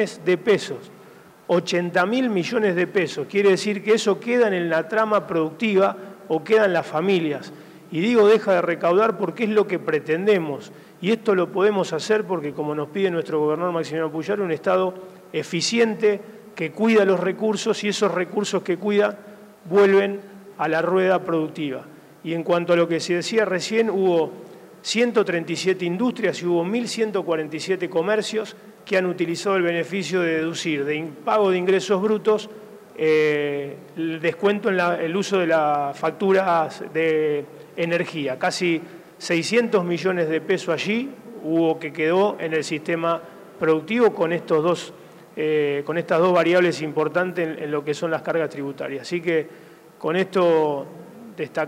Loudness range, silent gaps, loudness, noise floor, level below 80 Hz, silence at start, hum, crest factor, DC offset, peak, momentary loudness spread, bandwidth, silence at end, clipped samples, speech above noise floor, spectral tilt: 3 LU; none; -22 LUFS; -47 dBFS; -74 dBFS; 0 s; none; 16 dB; under 0.1%; -4 dBFS; 11 LU; 15.5 kHz; 0 s; under 0.1%; 26 dB; -5 dB/octave